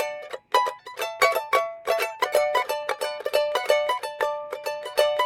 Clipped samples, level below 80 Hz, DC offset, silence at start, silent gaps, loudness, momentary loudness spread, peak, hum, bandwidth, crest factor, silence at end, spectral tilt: under 0.1%; -66 dBFS; under 0.1%; 0 s; none; -25 LUFS; 9 LU; -6 dBFS; none; 18 kHz; 20 dB; 0 s; 0 dB/octave